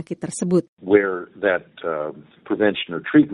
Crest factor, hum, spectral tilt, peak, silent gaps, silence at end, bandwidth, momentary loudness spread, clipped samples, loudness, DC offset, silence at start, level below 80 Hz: 20 dB; none; -5.5 dB/octave; -2 dBFS; 0.68-0.77 s; 0 s; 11 kHz; 10 LU; under 0.1%; -22 LUFS; under 0.1%; 0 s; -62 dBFS